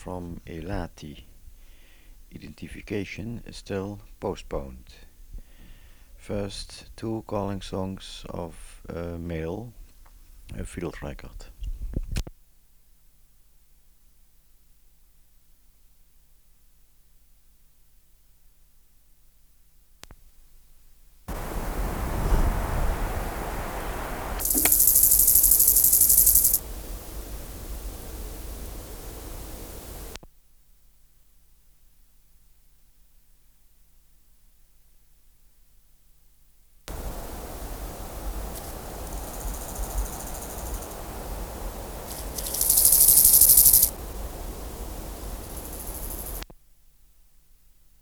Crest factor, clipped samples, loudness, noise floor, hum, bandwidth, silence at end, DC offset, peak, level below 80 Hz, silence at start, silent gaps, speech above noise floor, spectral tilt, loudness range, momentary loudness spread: 24 dB; under 0.1%; -21 LUFS; -58 dBFS; none; over 20 kHz; 1.5 s; 0.1%; -4 dBFS; -38 dBFS; 0 s; none; 24 dB; -2.5 dB/octave; 24 LU; 25 LU